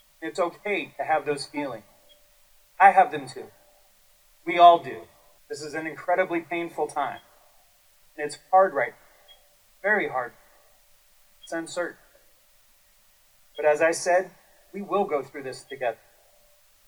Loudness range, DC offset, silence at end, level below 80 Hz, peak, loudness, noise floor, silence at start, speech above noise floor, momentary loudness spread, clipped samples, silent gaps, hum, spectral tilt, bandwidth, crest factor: 9 LU; under 0.1%; 0.95 s; -68 dBFS; -2 dBFS; -24 LUFS; -60 dBFS; 0.2 s; 36 dB; 22 LU; under 0.1%; none; none; -3.5 dB/octave; over 20 kHz; 24 dB